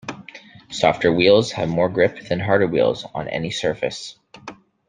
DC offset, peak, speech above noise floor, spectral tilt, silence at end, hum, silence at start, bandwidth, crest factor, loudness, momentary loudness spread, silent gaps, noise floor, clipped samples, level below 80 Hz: under 0.1%; -2 dBFS; 24 dB; -5.5 dB/octave; 0.35 s; none; 0.05 s; 9.6 kHz; 20 dB; -19 LUFS; 23 LU; none; -43 dBFS; under 0.1%; -54 dBFS